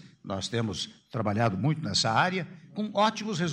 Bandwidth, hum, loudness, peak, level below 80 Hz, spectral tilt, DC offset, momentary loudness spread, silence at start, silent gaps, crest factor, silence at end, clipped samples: 10.5 kHz; none; -28 LUFS; -10 dBFS; -64 dBFS; -4.5 dB/octave; under 0.1%; 11 LU; 0.05 s; none; 20 dB; 0 s; under 0.1%